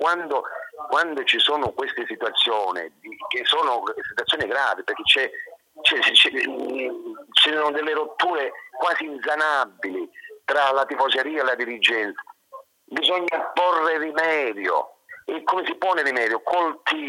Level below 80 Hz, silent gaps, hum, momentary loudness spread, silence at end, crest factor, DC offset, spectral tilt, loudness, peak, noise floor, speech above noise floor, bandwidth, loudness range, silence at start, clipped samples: -66 dBFS; none; none; 13 LU; 0 s; 22 dB; under 0.1%; -2 dB/octave; -21 LUFS; 0 dBFS; -46 dBFS; 23 dB; 16.5 kHz; 4 LU; 0 s; under 0.1%